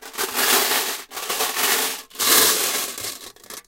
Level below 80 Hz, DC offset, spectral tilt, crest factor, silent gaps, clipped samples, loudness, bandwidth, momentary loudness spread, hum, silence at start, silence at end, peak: -64 dBFS; under 0.1%; 1 dB/octave; 22 dB; none; under 0.1%; -19 LUFS; 17 kHz; 15 LU; none; 0 s; 0.05 s; 0 dBFS